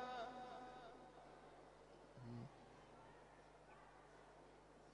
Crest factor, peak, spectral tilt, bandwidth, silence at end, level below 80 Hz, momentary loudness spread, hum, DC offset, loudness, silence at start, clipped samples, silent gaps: 20 dB; -40 dBFS; -5.5 dB/octave; 10 kHz; 0 s; -76 dBFS; 11 LU; 50 Hz at -75 dBFS; under 0.1%; -60 LUFS; 0 s; under 0.1%; none